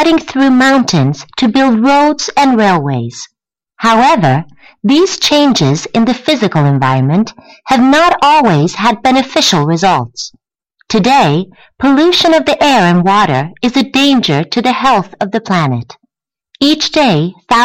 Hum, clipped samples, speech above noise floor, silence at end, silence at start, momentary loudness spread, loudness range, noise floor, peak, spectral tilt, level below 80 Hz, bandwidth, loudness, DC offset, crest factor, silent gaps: none; under 0.1%; 54 dB; 0 s; 0 s; 8 LU; 2 LU; -63 dBFS; 0 dBFS; -5 dB/octave; -44 dBFS; 15.5 kHz; -10 LUFS; under 0.1%; 10 dB; none